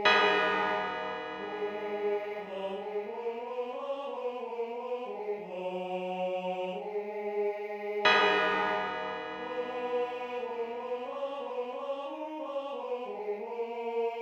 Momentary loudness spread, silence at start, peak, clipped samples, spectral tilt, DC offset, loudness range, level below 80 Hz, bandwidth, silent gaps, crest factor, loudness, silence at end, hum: 11 LU; 0 s; -12 dBFS; under 0.1%; -4 dB/octave; under 0.1%; 7 LU; -78 dBFS; 8.6 kHz; none; 22 dB; -33 LUFS; 0 s; none